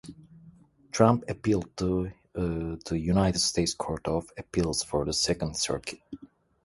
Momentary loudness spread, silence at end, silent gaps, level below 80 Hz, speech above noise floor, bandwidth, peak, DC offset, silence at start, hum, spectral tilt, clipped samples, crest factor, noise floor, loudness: 13 LU; 0.4 s; none; -46 dBFS; 28 dB; 11.5 kHz; -6 dBFS; under 0.1%; 0.05 s; none; -4.5 dB/octave; under 0.1%; 22 dB; -55 dBFS; -28 LUFS